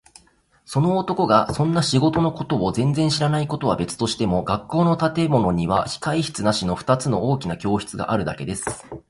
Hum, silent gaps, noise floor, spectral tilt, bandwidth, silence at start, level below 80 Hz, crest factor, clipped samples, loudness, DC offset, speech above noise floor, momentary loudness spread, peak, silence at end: none; none; -58 dBFS; -6 dB/octave; 11.5 kHz; 0.7 s; -46 dBFS; 18 dB; under 0.1%; -21 LUFS; under 0.1%; 37 dB; 6 LU; -2 dBFS; 0.1 s